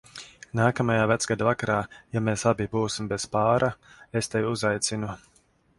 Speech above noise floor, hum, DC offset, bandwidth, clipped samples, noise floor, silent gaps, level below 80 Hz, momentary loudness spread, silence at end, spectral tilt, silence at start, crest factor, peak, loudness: 20 dB; none; under 0.1%; 11.5 kHz; under 0.1%; -46 dBFS; none; -54 dBFS; 11 LU; 0.6 s; -5 dB/octave; 0.15 s; 20 dB; -6 dBFS; -26 LUFS